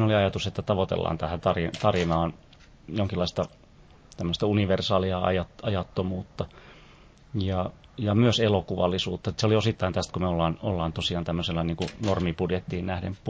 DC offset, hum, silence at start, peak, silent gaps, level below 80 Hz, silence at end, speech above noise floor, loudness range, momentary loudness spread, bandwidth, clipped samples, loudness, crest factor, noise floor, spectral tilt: under 0.1%; none; 0 s; -6 dBFS; none; -42 dBFS; 0 s; 27 dB; 3 LU; 8 LU; 8 kHz; under 0.1%; -27 LUFS; 20 dB; -53 dBFS; -6.5 dB/octave